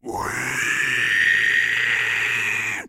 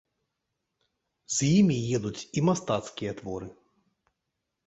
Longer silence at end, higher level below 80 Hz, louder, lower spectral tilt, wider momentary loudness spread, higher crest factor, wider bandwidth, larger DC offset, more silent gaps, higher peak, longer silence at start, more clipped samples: second, 0 s vs 1.15 s; first, -54 dBFS vs -60 dBFS; first, -19 LUFS vs -27 LUFS; second, -1.5 dB/octave vs -5.5 dB/octave; second, 7 LU vs 15 LU; about the same, 14 dB vs 18 dB; first, 16 kHz vs 8.2 kHz; neither; neither; first, -6 dBFS vs -12 dBFS; second, 0.05 s vs 1.3 s; neither